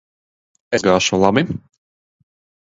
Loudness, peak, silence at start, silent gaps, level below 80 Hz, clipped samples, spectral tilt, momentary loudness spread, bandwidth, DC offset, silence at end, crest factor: -17 LUFS; 0 dBFS; 0.7 s; none; -48 dBFS; under 0.1%; -4.5 dB/octave; 10 LU; 8 kHz; under 0.1%; 1.05 s; 20 dB